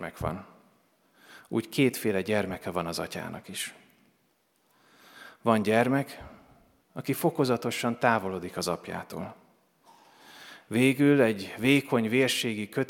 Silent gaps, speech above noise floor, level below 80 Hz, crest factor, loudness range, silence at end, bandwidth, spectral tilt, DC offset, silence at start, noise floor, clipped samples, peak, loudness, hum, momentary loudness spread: none; 43 dB; -62 dBFS; 22 dB; 6 LU; 0.05 s; 18 kHz; -5 dB/octave; under 0.1%; 0 s; -70 dBFS; under 0.1%; -6 dBFS; -28 LUFS; none; 16 LU